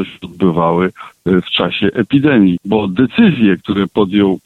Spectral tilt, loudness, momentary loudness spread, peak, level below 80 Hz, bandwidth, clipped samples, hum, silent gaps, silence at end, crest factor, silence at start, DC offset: -8.5 dB/octave; -13 LUFS; 6 LU; 0 dBFS; -46 dBFS; 4.3 kHz; under 0.1%; none; none; 0.05 s; 12 dB; 0 s; under 0.1%